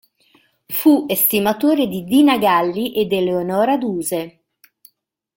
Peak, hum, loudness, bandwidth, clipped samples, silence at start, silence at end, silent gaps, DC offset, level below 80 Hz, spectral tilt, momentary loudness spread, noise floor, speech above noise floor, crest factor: -2 dBFS; none; -17 LUFS; 17 kHz; under 0.1%; 0.7 s; 1.05 s; none; under 0.1%; -58 dBFS; -4.5 dB/octave; 9 LU; -64 dBFS; 48 dB; 16 dB